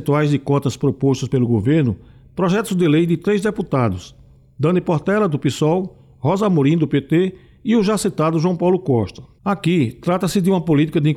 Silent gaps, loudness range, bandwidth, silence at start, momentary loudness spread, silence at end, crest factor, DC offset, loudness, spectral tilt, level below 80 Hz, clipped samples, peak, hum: none; 1 LU; 14.5 kHz; 0 s; 6 LU; 0 s; 10 dB; under 0.1%; -18 LUFS; -7 dB/octave; -50 dBFS; under 0.1%; -8 dBFS; none